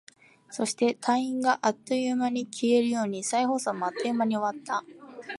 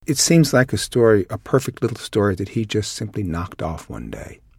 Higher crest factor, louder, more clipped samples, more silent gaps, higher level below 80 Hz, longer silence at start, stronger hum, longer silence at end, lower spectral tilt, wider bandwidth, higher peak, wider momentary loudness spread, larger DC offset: about the same, 18 dB vs 18 dB; second, -27 LUFS vs -20 LUFS; neither; neither; second, -80 dBFS vs -44 dBFS; first, 0.5 s vs 0.1 s; neither; second, 0 s vs 0.25 s; about the same, -4 dB/octave vs -5 dB/octave; second, 11.5 kHz vs 16.5 kHz; second, -10 dBFS vs -2 dBFS; second, 8 LU vs 17 LU; neither